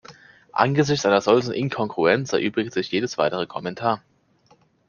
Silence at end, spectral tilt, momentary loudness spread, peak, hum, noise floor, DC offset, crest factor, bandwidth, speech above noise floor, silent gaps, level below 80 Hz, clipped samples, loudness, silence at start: 0.9 s; -5.5 dB/octave; 8 LU; -2 dBFS; none; -59 dBFS; under 0.1%; 20 dB; 7.2 kHz; 38 dB; none; -62 dBFS; under 0.1%; -22 LUFS; 0.1 s